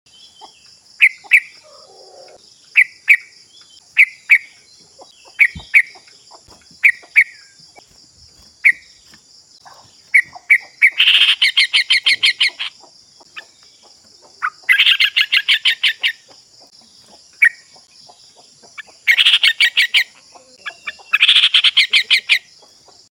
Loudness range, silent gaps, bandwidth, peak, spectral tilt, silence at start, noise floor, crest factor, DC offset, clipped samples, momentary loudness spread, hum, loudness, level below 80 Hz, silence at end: 5 LU; none; 17 kHz; 0 dBFS; 2.5 dB/octave; 1 s; -47 dBFS; 18 dB; under 0.1%; under 0.1%; 12 LU; none; -12 LUFS; -60 dBFS; 0.7 s